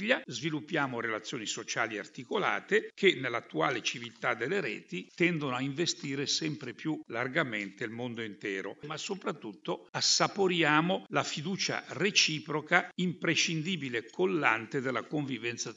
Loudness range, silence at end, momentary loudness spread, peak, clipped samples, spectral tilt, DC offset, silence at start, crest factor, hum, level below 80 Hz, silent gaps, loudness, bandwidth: 5 LU; 0 s; 11 LU; -6 dBFS; under 0.1%; -3.5 dB/octave; under 0.1%; 0 s; 26 dB; none; -82 dBFS; 9.89-9.93 s; -31 LUFS; 8 kHz